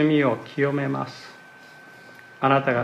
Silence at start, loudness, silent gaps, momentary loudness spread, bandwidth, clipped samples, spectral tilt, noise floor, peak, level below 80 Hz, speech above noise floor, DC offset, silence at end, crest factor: 0 s; -23 LUFS; none; 25 LU; 9.4 kHz; under 0.1%; -7.5 dB/octave; -47 dBFS; -6 dBFS; -72 dBFS; 25 dB; under 0.1%; 0 s; 20 dB